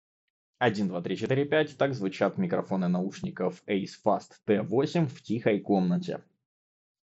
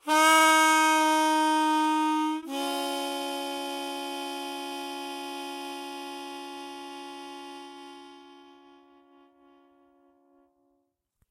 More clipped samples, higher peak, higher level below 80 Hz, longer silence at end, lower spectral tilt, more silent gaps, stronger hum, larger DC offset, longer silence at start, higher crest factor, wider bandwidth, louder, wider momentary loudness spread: neither; about the same, -10 dBFS vs -10 dBFS; first, -70 dBFS vs -80 dBFS; second, 0.85 s vs 2.9 s; first, -6 dB/octave vs 0.5 dB/octave; neither; neither; neither; first, 0.6 s vs 0.05 s; about the same, 20 dB vs 20 dB; second, 8 kHz vs 16 kHz; second, -29 LUFS vs -26 LUFS; second, 6 LU vs 22 LU